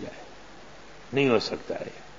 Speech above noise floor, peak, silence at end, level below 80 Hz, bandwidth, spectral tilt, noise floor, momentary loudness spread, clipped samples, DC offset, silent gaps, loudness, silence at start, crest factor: 21 dB; -10 dBFS; 0 s; -60 dBFS; 7.6 kHz; -5.5 dB/octave; -48 dBFS; 24 LU; under 0.1%; 0.4%; none; -27 LUFS; 0 s; 22 dB